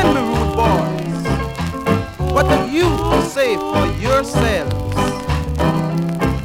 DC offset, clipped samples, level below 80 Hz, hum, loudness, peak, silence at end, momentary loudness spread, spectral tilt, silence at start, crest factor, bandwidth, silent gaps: under 0.1%; under 0.1%; -28 dBFS; none; -18 LUFS; -2 dBFS; 0 s; 5 LU; -6 dB/octave; 0 s; 14 dB; 17 kHz; none